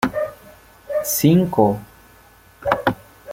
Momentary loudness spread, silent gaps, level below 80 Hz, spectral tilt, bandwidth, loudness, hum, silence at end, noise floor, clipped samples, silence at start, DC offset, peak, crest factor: 14 LU; none; -50 dBFS; -5.5 dB/octave; 17 kHz; -20 LUFS; none; 0 s; -49 dBFS; under 0.1%; 0 s; under 0.1%; -2 dBFS; 20 dB